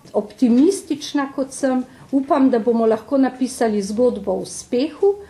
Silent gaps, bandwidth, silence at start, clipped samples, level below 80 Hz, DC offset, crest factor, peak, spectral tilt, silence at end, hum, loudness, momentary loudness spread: none; 12.5 kHz; 0.05 s; under 0.1%; -56 dBFS; under 0.1%; 14 dB; -4 dBFS; -5 dB/octave; 0.05 s; none; -19 LUFS; 9 LU